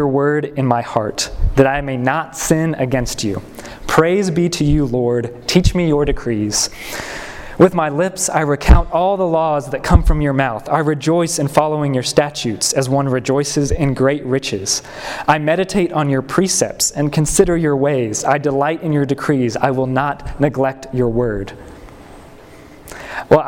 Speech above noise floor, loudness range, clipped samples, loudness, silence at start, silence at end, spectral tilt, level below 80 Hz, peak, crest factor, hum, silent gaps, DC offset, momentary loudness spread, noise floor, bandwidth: 24 dB; 2 LU; under 0.1%; -16 LUFS; 0 s; 0 s; -5 dB/octave; -26 dBFS; 0 dBFS; 16 dB; none; none; under 0.1%; 7 LU; -39 dBFS; 17 kHz